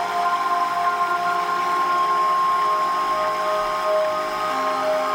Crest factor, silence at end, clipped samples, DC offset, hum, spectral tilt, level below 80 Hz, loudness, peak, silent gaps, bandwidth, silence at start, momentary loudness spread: 10 dB; 0 s; under 0.1%; under 0.1%; none; -2.5 dB/octave; -60 dBFS; -21 LUFS; -10 dBFS; none; 16 kHz; 0 s; 3 LU